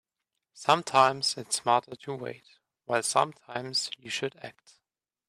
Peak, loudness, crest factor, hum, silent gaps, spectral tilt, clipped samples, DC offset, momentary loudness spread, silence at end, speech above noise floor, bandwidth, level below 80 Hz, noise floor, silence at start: -8 dBFS; -28 LUFS; 22 dB; none; none; -2.5 dB/octave; under 0.1%; under 0.1%; 16 LU; 0.75 s; 57 dB; 15 kHz; -76 dBFS; -86 dBFS; 0.55 s